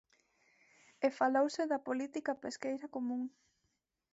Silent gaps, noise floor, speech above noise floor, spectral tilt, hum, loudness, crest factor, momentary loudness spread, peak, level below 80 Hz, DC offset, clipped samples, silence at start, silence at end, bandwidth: none; -83 dBFS; 48 dB; -2.5 dB/octave; none; -36 LUFS; 20 dB; 9 LU; -18 dBFS; -84 dBFS; under 0.1%; under 0.1%; 1 s; 0.85 s; 8 kHz